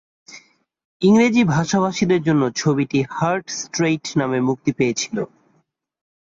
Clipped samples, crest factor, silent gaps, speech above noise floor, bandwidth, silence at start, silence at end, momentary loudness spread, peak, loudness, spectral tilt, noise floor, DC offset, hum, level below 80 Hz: under 0.1%; 16 dB; 0.85-1.00 s; 46 dB; 7.8 kHz; 0.3 s; 1.15 s; 9 LU; -4 dBFS; -19 LUFS; -5.5 dB/octave; -65 dBFS; under 0.1%; none; -56 dBFS